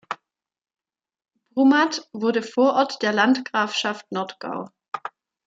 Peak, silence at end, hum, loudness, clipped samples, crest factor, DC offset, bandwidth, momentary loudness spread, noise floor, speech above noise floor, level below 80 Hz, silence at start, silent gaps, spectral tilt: -4 dBFS; 0.4 s; none; -22 LUFS; under 0.1%; 20 dB; under 0.1%; 7.8 kHz; 16 LU; -69 dBFS; 48 dB; -78 dBFS; 0.1 s; 4.88-4.92 s; -4 dB/octave